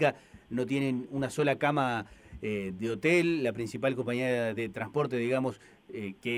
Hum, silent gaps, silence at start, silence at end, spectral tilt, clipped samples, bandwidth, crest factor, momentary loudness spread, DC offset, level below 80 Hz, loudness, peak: none; none; 0 s; 0 s; -6 dB/octave; under 0.1%; 15.5 kHz; 18 dB; 14 LU; under 0.1%; -62 dBFS; -31 LUFS; -12 dBFS